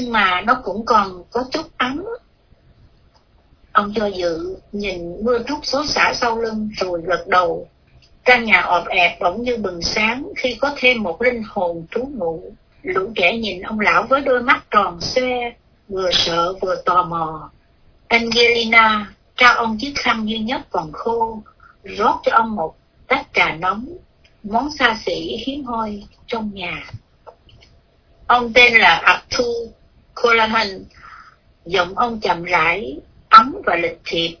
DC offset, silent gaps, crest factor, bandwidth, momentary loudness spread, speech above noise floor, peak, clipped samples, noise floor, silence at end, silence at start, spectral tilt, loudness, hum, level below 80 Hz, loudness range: under 0.1%; none; 18 dB; 5.4 kHz; 14 LU; 36 dB; 0 dBFS; under 0.1%; -54 dBFS; 0.05 s; 0 s; -3.5 dB/octave; -17 LUFS; none; -46 dBFS; 7 LU